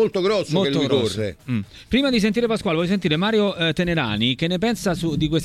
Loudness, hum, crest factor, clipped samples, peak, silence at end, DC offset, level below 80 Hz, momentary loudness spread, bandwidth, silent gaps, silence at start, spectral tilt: -21 LUFS; none; 16 dB; under 0.1%; -6 dBFS; 0 s; under 0.1%; -44 dBFS; 5 LU; 14.5 kHz; none; 0 s; -5.5 dB/octave